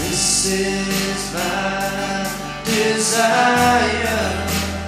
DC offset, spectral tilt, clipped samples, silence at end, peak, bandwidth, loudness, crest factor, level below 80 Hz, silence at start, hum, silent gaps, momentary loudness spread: under 0.1%; -3 dB/octave; under 0.1%; 0 s; -2 dBFS; 16 kHz; -18 LUFS; 16 dB; -38 dBFS; 0 s; none; none; 7 LU